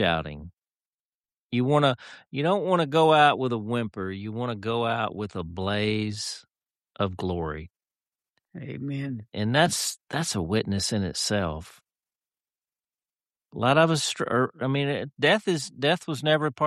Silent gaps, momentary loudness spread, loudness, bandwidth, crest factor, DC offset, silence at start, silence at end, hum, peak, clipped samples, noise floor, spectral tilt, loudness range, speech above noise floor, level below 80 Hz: 0.53-0.57 s, 0.85-1.24 s, 1.41-1.50 s; 13 LU; -26 LUFS; 13 kHz; 20 dB; under 0.1%; 0 s; 0 s; none; -6 dBFS; under 0.1%; under -90 dBFS; -4.5 dB/octave; 7 LU; over 65 dB; -54 dBFS